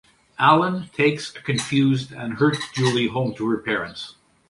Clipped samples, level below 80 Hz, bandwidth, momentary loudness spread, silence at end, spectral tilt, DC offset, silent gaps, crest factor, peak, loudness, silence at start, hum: under 0.1%; -58 dBFS; 11.5 kHz; 14 LU; 0.4 s; -5.5 dB/octave; under 0.1%; none; 20 dB; -2 dBFS; -21 LUFS; 0.4 s; none